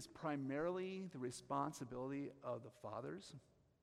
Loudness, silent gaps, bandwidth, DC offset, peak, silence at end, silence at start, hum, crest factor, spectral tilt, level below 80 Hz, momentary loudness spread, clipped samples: -47 LUFS; none; 15 kHz; under 0.1%; -28 dBFS; 0.4 s; 0 s; none; 18 dB; -6 dB/octave; -78 dBFS; 9 LU; under 0.1%